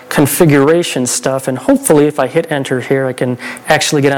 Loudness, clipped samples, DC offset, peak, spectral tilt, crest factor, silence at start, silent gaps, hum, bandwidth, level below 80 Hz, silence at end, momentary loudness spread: -12 LUFS; under 0.1%; under 0.1%; 0 dBFS; -4.5 dB/octave; 12 dB; 0 s; none; none; 19 kHz; -46 dBFS; 0 s; 7 LU